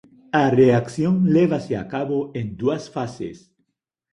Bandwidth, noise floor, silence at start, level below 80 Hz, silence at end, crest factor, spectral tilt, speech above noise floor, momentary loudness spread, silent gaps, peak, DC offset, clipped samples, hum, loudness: 10.5 kHz; -78 dBFS; 0.35 s; -54 dBFS; 0.75 s; 18 dB; -7.5 dB/octave; 58 dB; 14 LU; none; -4 dBFS; under 0.1%; under 0.1%; none; -21 LUFS